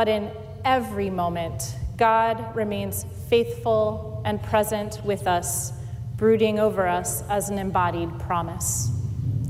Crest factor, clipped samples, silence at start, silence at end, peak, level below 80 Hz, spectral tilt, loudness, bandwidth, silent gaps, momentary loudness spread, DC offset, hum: 14 dB; under 0.1%; 0 s; 0 s; -10 dBFS; -42 dBFS; -5 dB/octave; -24 LUFS; 16 kHz; none; 9 LU; under 0.1%; none